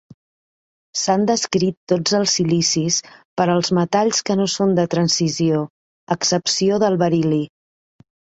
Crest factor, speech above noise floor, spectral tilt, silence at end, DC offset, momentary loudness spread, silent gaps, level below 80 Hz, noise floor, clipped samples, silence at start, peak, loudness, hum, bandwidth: 18 dB; over 72 dB; -4.5 dB/octave; 0.9 s; under 0.1%; 6 LU; 1.77-1.87 s, 3.25-3.36 s, 5.70-6.07 s; -58 dBFS; under -90 dBFS; under 0.1%; 0.95 s; -2 dBFS; -18 LUFS; none; 8.2 kHz